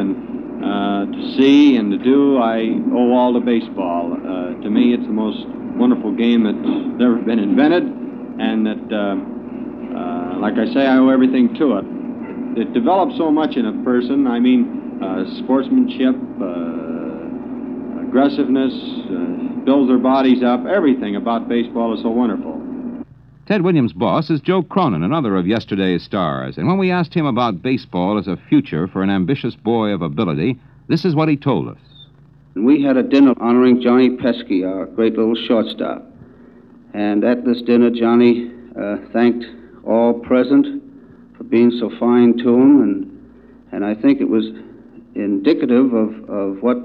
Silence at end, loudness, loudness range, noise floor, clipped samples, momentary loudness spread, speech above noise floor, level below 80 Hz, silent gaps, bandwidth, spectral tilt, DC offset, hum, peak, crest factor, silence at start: 0 s; -17 LUFS; 4 LU; -46 dBFS; under 0.1%; 13 LU; 31 dB; -54 dBFS; none; 6 kHz; -8.5 dB/octave; under 0.1%; none; -2 dBFS; 14 dB; 0 s